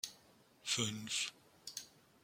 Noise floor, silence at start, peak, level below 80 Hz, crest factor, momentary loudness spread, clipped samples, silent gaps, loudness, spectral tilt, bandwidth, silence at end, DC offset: -67 dBFS; 0.05 s; -20 dBFS; -80 dBFS; 24 dB; 15 LU; under 0.1%; none; -40 LUFS; -1.5 dB/octave; 16.5 kHz; 0.35 s; under 0.1%